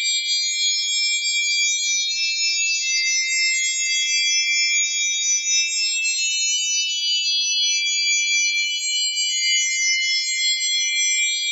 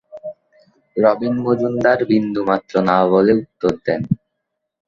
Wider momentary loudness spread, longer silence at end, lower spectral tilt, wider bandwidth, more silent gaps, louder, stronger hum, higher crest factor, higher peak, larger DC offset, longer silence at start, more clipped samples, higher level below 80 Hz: second, 2 LU vs 11 LU; second, 0 s vs 0.7 s; second, 11 dB/octave vs -8 dB/octave; first, 16 kHz vs 7.4 kHz; neither; about the same, -18 LUFS vs -17 LUFS; neither; about the same, 14 dB vs 16 dB; second, -8 dBFS vs -2 dBFS; neither; second, 0 s vs 0.15 s; neither; second, under -90 dBFS vs -52 dBFS